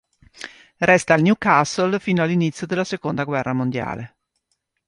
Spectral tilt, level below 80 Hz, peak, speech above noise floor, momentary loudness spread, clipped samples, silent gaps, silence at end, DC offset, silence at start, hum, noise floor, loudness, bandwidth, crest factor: -6 dB/octave; -56 dBFS; -2 dBFS; 54 dB; 21 LU; under 0.1%; none; 0.8 s; under 0.1%; 0.4 s; none; -73 dBFS; -20 LUFS; 11 kHz; 20 dB